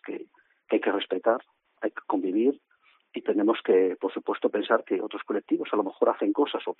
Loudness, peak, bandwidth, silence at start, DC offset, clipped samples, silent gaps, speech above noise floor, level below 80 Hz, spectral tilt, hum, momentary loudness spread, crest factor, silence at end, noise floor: -27 LUFS; -8 dBFS; 4.1 kHz; 0.05 s; under 0.1%; under 0.1%; none; 25 dB; -82 dBFS; -2.5 dB/octave; none; 11 LU; 20 dB; 0.05 s; -51 dBFS